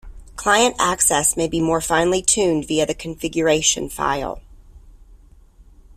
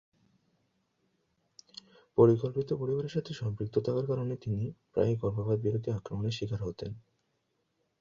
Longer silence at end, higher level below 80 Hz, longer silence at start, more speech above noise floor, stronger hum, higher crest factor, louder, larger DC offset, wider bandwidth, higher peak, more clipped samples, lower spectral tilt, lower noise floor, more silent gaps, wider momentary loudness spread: second, 0.35 s vs 1 s; first, -42 dBFS vs -58 dBFS; second, 0.05 s vs 2.15 s; second, 29 dB vs 48 dB; neither; about the same, 18 dB vs 22 dB; first, -18 LUFS vs -31 LUFS; neither; first, 16 kHz vs 7.4 kHz; first, -2 dBFS vs -10 dBFS; neither; second, -2.5 dB/octave vs -8.5 dB/octave; second, -48 dBFS vs -78 dBFS; neither; second, 10 LU vs 18 LU